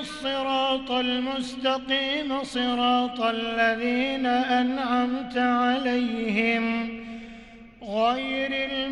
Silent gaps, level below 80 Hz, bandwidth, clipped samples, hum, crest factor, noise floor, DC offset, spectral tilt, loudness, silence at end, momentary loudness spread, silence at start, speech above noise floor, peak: none; -56 dBFS; 11 kHz; under 0.1%; none; 16 dB; -46 dBFS; under 0.1%; -4 dB/octave; -25 LUFS; 0 s; 7 LU; 0 s; 21 dB; -10 dBFS